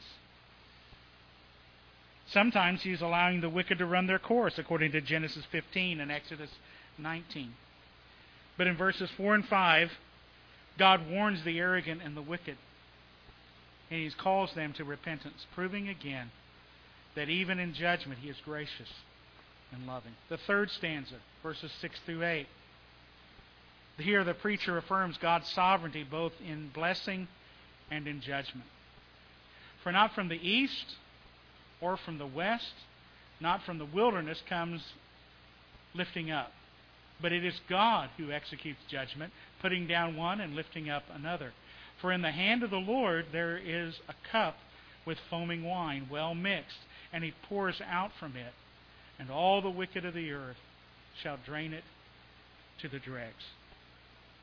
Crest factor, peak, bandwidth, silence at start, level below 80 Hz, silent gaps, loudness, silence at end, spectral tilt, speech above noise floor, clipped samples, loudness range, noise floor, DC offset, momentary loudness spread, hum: 26 dB; -10 dBFS; 5.4 kHz; 0 s; -64 dBFS; none; -33 LUFS; 0.9 s; -6.5 dB/octave; 25 dB; under 0.1%; 8 LU; -59 dBFS; under 0.1%; 18 LU; 60 Hz at -60 dBFS